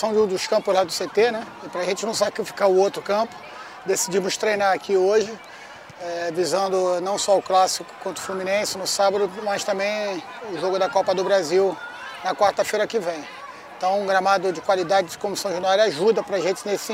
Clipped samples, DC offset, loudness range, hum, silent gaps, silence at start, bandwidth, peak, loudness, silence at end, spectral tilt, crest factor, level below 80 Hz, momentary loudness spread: under 0.1%; under 0.1%; 2 LU; none; none; 0 s; 16 kHz; -6 dBFS; -22 LUFS; 0 s; -3 dB/octave; 18 dB; -66 dBFS; 13 LU